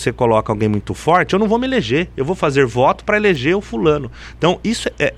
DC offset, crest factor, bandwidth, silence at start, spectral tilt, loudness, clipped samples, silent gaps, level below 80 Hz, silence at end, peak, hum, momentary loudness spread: under 0.1%; 14 dB; 12.5 kHz; 0 s; -6 dB/octave; -16 LUFS; under 0.1%; none; -38 dBFS; 0 s; -2 dBFS; none; 5 LU